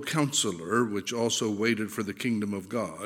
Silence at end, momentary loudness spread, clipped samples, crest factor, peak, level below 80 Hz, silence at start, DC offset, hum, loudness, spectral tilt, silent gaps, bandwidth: 0 s; 6 LU; under 0.1%; 18 dB; -10 dBFS; -72 dBFS; 0 s; under 0.1%; none; -28 LUFS; -3.5 dB/octave; none; 17 kHz